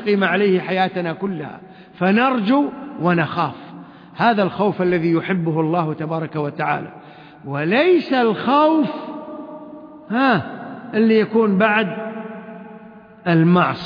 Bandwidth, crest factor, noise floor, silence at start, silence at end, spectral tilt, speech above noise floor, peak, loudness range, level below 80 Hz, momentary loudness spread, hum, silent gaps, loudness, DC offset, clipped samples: 5.2 kHz; 16 dB; -41 dBFS; 0 s; 0 s; -9 dB/octave; 24 dB; -2 dBFS; 2 LU; -64 dBFS; 20 LU; none; none; -18 LUFS; under 0.1%; under 0.1%